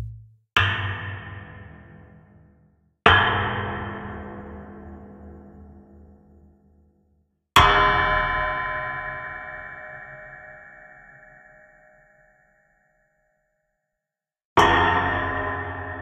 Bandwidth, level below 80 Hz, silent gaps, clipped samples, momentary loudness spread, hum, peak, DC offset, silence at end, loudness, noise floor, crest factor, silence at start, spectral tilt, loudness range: 15.5 kHz; -42 dBFS; 14.45-14.56 s; under 0.1%; 26 LU; none; 0 dBFS; under 0.1%; 0 s; -21 LUFS; -88 dBFS; 26 dB; 0 s; -4.5 dB/octave; 19 LU